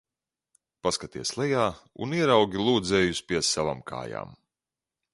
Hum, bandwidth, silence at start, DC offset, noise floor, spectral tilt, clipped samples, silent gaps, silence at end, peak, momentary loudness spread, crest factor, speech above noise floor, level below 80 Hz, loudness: none; 11.5 kHz; 0.85 s; under 0.1%; under -90 dBFS; -4 dB/octave; under 0.1%; none; 0.8 s; -6 dBFS; 14 LU; 22 dB; over 64 dB; -54 dBFS; -26 LUFS